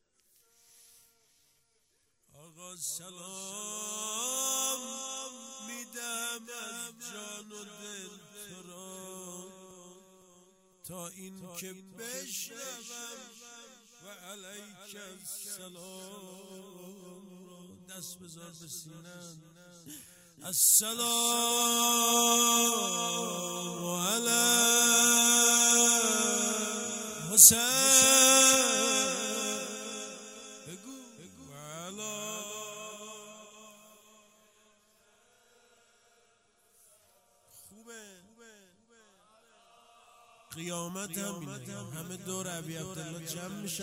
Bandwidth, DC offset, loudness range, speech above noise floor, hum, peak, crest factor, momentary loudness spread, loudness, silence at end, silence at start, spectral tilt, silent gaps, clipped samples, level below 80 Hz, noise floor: 16 kHz; under 0.1%; 25 LU; 43 dB; none; -2 dBFS; 30 dB; 26 LU; -25 LUFS; 0 s; 2.6 s; -0.5 dB/octave; none; under 0.1%; -74 dBFS; -74 dBFS